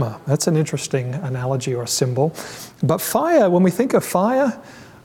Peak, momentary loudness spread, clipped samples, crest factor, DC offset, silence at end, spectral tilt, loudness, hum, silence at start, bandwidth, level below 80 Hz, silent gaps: -4 dBFS; 9 LU; under 0.1%; 14 dB; under 0.1%; 0.15 s; -5.5 dB/octave; -19 LUFS; none; 0 s; 18 kHz; -60 dBFS; none